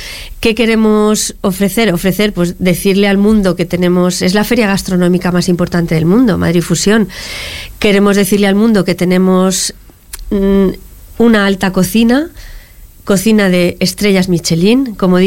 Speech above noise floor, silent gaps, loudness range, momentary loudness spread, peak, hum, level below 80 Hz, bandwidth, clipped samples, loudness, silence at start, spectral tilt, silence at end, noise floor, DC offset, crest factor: 24 dB; none; 1 LU; 6 LU; 0 dBFS; none; -32 dBFS; 17 kHz; under 0.1%; -11 LUFS; 0 s; -5 dB/octave; 0 s; -34 dBFS; 1%; 10 dB